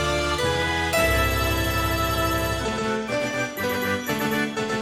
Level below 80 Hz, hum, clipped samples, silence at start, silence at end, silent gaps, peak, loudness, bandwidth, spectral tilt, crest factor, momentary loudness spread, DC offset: -34 dBFS; none; under 0.1%; 0 s; 0 s; none; -10 dBFS; -23 LUFS; 16 kHz; -4 dB/octave; 14 dB; 5 LU; under 0.1%